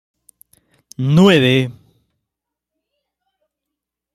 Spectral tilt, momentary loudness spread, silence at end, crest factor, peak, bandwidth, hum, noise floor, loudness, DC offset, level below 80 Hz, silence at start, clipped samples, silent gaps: -6.5 dB/octave; 13 LU; 2.4 s; 18 dB; -2 dBFS; 14 kHz; 60 Hz at -45 dBFS; -82 dBFS; -14 LUFS; under 0.1%; -56 dBFS; 1 s; under 0.1%; none